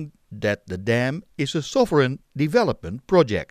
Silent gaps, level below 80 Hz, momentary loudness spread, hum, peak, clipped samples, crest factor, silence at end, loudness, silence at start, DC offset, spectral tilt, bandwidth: none; -52 dBFS; 8 LU; none; -2 dBFS; under 0.1%; 20 dB; 0.05 s; -22 LUFS; 0 s; under 0.1%; -6 dB/octave; 15.5 kHz